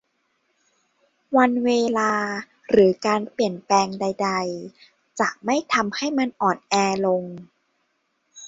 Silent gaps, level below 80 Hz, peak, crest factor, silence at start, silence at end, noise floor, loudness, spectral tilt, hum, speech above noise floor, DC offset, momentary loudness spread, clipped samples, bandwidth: none; -62 dBFS; -4 dBFS; 18 dB; 1.3 s; 0 s; -71 dBFS; -22 LUFS; -4.5 dB/octave; none; 50 dB; under 0.1%; 12 LU; under 0.1%; 8 kHz